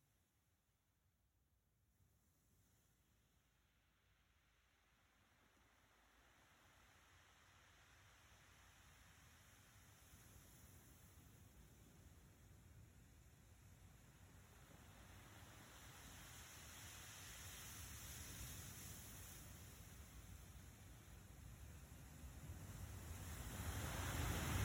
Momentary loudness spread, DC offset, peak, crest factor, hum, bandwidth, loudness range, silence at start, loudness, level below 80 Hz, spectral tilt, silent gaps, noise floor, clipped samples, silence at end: 17 LU; under 0.1%; -32 dBFS; 24 dB; none; 16.5 kHz; 13 LU; 1.9 s; -55 LUFS; -64 dBFS; -4 dB/octave; none; -84 dBFS; under 0.1%; 0 s